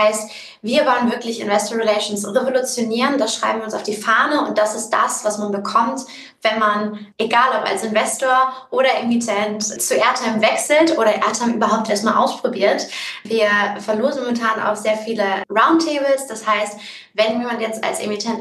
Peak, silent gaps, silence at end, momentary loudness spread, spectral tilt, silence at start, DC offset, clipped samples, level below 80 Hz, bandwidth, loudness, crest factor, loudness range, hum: 0 dBFS; none; 0 s; 7 LU; -3 dB/octave; 0 s; under 0.1%; under 0.1%; -74 dBFS; 12.5 kHz; -18 LUFS; 18 dB; 2 LU; none